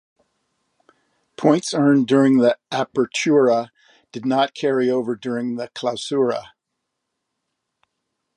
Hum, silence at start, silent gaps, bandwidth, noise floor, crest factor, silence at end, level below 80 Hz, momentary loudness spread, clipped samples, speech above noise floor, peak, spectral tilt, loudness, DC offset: none; 1.4 s; none; 11 kHz; -79 dBFS; 20 dB; 1.9 s; -72 dBFS; 10 LU; under 0.1%; 60 dB; -2 dBFS; -5.5 dB/octave; -19 LUFS; under 0.1%